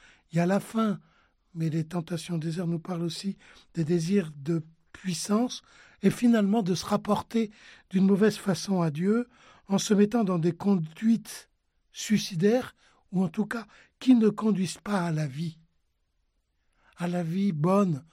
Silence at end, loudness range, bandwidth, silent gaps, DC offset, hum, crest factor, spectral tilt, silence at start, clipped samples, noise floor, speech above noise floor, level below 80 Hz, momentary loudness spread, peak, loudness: 0.1 s; 5 LU; 15 kHz; none; under 0.1%; none; 18 dB; -6.5 dB/octave; 0.35 s; under 0.1%; -74 dBFS; 47 dB; -66 dBFS; 13 LU; -10 dBFS; -27 LUFS